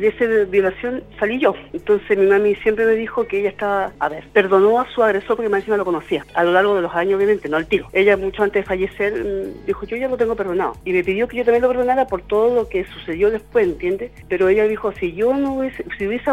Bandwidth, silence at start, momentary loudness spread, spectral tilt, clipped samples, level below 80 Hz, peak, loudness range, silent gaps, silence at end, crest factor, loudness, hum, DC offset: 9.6 kHz; 0 s; 9 LU; -6.5 dB/octave; under 0.1%; -44 dBFS; 0 dBFS; 2 LU; none; 0 s; 18 dB; -19 LUFS; none; under 0.1%